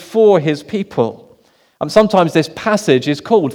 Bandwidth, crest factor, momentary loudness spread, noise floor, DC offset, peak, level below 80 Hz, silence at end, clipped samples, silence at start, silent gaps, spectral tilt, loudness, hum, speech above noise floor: 15 kHz; 14 dB; 9 LU; -52 dBFS; under 0.1%; 0 dBFS; -52 dBFS; 0 s; 0.1%; 0 s; none; -6 dB/octave; -14 LUFS; none; 38 dB